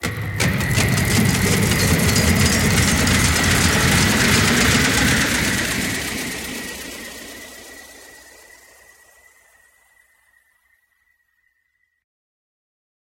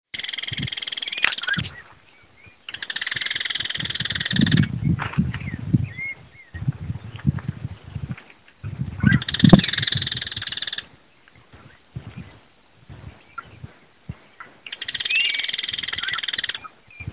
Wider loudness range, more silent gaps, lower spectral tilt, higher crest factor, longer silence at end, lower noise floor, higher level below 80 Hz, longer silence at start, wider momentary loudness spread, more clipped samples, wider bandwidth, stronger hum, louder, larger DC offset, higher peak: first, 18 LU vs 15 LU; neither; second, -3.5 dB/octave vs -9.5 dB/octave; second, 18 dB vs 24 dB; first, 5 s vs 0 s; first, -69 dBFS vs -55 dBFS; first, -34 dBFS vs -42 dBFS; second, 0 s vs 0.15 s; second, 18 LU vs 22 LU; neither; first, 17 kHz vs 4 kHz; neither; first, -17 LUFS vs -23 LUFS; second, under 0.1% vs 0.1%; about the same, -2 dBFS vs 0 dBFS